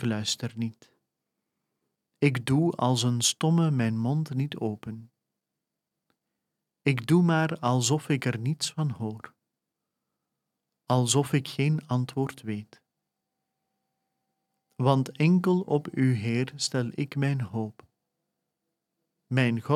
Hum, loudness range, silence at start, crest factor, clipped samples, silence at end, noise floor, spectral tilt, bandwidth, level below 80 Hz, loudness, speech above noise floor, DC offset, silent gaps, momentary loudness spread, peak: none; 6 LU; 0 s; 22 dB; under 0.1%; 0 s; -86 dBFS; -5.5 dB/octave; 14.5 kHz; -70 dBFS; -27 LUFS; 60 dB; under 0.1%; none; 11 LU; -6 dBFS